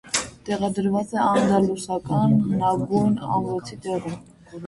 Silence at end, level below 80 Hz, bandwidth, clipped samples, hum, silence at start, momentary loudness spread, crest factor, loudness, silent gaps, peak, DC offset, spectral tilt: 0 s; -54 dBFS; 11.5 kHz; under 0.1%; none; 0.05 s; 10 LU; 16 dB; -23 LUFS; none; -6 dBFS; under 0.1%; -6 dB/octave